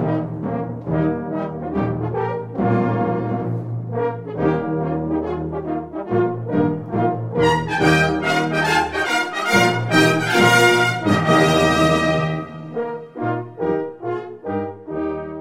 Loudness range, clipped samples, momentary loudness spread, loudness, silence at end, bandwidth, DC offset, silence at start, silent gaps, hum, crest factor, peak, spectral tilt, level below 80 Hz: 7 LU; under 0.1%; 11 LU; -20 LUFS; 0 s; 16 kHz; under 0.1%; 0 s; none; none; 18 dB; -2 dBFS; -5.5 dB/octave; -44 dBFS